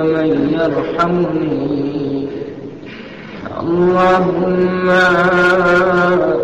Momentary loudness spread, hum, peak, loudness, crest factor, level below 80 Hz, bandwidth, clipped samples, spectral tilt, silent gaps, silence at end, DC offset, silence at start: 18 LU; none; -4 dBFS; -14 LUFS; 10 dB; -44 dBFS; 8.2 kHz; under 0.1%; -7 dB/octave; none; 0 s; 0.3%; 0 s